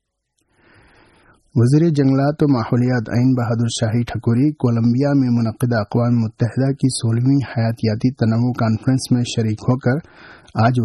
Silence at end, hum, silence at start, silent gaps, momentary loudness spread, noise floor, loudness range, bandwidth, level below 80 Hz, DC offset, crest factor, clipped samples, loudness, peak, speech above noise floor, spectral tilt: 0 s; none; 1.55 s; none; 5 LU; -70 dBFS; 1 LU; 12 kHz; -50 dBFS; under 0.1%; 12 dB; under 0.1%; -18 LUFS; -4 dBFS; 53 dB; -7 dB/octave